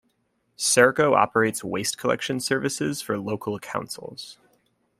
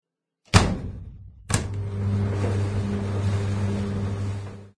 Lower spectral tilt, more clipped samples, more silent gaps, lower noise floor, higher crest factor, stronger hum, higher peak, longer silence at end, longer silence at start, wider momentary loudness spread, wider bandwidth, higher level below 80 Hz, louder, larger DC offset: second, -3.5 dB/octave vs -5.5 dB/octave; neither; neither; first, -71 dBFS vs -62 dBFS; about the same, 22 dB vs 24 dB; neither; about the same, -2 dBFS vs 0 dBFS; first, 0.65 s vs 0.1 s; about the same, 0.6 s vs 0.55 s; first, 17 LU vs 14 LU; first, 16 kHz vs 11 kHz; second, -64 dBFS vs -38 dBFS; first, -23 LUFS vs -26 LUFS; neither